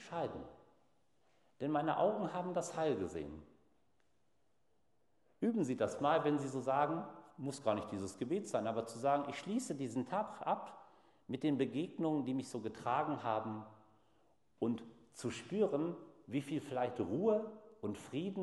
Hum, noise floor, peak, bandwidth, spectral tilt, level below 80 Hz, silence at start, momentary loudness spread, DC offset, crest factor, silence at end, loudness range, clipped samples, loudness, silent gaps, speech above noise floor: none; -81 dBFS; -20 dBFS; 12 kHz; -6 dB/octave; -74 dBFS; 0 s; 11 LU; under 0.1%; 20 dB; 0 s; 4 LU; under 0.1%; -39 LUFS; none; 43 dB